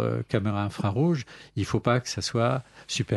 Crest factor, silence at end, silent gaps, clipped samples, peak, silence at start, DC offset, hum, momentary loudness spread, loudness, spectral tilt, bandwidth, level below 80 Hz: 20 dB; 0 s; none; under 0.1%; -8 dBFS; 0 s; under 0.1%; none; 8 LU; -27 LUFS; -5.5 dB/octave; 12 kHz; -56 dBFS